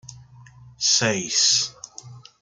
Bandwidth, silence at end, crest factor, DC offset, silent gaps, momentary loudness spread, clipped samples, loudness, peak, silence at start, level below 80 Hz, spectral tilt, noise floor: 12 kHz; 0.25 s; 18 dB; under 0.1%; none; 23 LU; under 0.1%; -19 LUFS; -6 dBFS; 0.05 s; -62 dBFS; -1 dB/octave; -47 dBFS